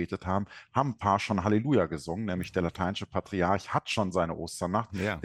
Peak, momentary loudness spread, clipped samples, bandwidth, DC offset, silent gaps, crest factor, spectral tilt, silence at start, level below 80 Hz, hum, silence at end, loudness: -10 dBFS; 6 LU; under 0.1%; 14 kHz; under 0.1%; none; 20 dB; -6 dB/octave; 0 s; -54 dBFS; none; 0 s; -30 LUFS